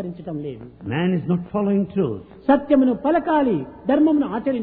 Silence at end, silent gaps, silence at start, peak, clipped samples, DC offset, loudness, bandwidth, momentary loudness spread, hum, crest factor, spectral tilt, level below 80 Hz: 0 s; none; 0 s; -4 dBFS; under 0.1%; under 0.1%; -21 LUFS; 4.3 kHz; 13 LU; none; 16 dB; -12 dB/octave; -52 dBFS